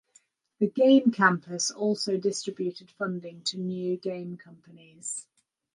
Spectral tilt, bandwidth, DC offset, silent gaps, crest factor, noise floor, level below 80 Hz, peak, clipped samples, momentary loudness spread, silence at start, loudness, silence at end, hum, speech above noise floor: -4 dB/octave; 11.5 kHz; under 0.1%; none; 22 dB; -64 dBFS; -78 dBFS; -6 dBFS; under 0.1%; 16 LU; 0.6 s; -27 LUFS; 0.55 s; none; 37 dB